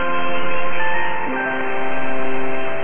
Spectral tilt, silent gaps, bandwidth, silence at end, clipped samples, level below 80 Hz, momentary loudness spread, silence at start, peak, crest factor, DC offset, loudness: -8 dB/octave; none; 3.6 kHz; 0 s; under 0.1%; -54 dBFS; 3 LU; 0 s; -6 dBFS; 8 dB; under 0.1%; -23 LUFS